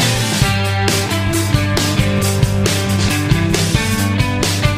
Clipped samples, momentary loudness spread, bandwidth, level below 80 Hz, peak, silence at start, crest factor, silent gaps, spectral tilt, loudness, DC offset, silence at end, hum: under 0.1%; 1 LU; 16 kHz; -28 dBFS; -2 dBFS; 0 s; 14 dB; none; -4.5 dB/octave; -15 LUFS; under 0.1%; 0 s; none